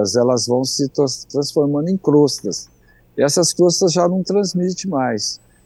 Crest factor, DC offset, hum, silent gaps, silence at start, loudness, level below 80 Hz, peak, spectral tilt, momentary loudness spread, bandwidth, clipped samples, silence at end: 14 dB; under 0.1%; none; none; 0 s; -17 LUFS; -58 dBFS; -2 dBFS; -4.5 dB/octave; 8 LU; 12.5 kHz; under 0.1%; 0.3 s